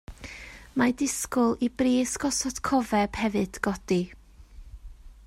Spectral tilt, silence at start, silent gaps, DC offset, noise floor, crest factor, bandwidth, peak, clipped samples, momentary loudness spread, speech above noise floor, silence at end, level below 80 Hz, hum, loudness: -4 dB/octave; 0.1 s; none; under 0.1%; -48 dBFS; 20 dB; 16 kHz; -8 dBFS; under 0.1%; 14 LU; 22 dB; 0.15 s; -48 dBFS; none; -26 LUFS